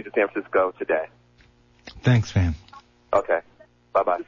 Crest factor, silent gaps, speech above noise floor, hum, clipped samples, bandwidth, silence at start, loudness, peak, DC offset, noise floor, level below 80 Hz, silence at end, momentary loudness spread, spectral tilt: 16 dB; none; 35 dB; 60 Hz at -40 dBFS; under 0.1%; 7.4 kHz; 0 s; -24 LUFS; -8 dBFS; under 0.1%; -57 dBFS; -48 dBFS; 0.05 s; 7 LU; -7.5 dB/octave